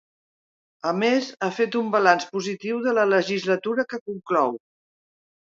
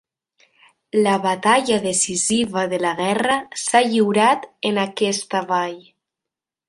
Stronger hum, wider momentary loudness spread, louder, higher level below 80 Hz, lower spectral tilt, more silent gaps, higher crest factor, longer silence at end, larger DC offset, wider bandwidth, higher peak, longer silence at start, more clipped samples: neither; about the same, 9 LU vs 7 LU; second, -23 LUFS vs -19 LUFS; second, -76 dBFS vs -62 dBFS; first, -5 dB/octave vs -3 dB/octave; first, 4.01-4.06 s vs none; about the same, 22 dB vs 18 dB; about the same, 1 s vs 0.9 s; neither; second, 7.8 kHz vs 11.5 kHz; about the same, -2 dBFS vs -2 dBFS; about the same, 0.85 s vs 0.95 s; neither